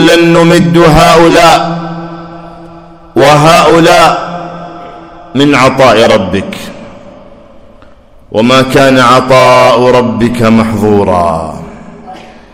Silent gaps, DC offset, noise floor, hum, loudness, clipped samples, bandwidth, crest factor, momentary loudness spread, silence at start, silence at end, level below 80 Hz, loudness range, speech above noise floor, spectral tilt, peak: none; under 0.1%; -36 dBFS; none; -5 LUFS; 9%; over 20 kHz; 8 dB; 19 LU; 0 s; 0.35 s; -32 dBFS; 4 LU; 31 dB; -5 dB/octave; 0 dBFS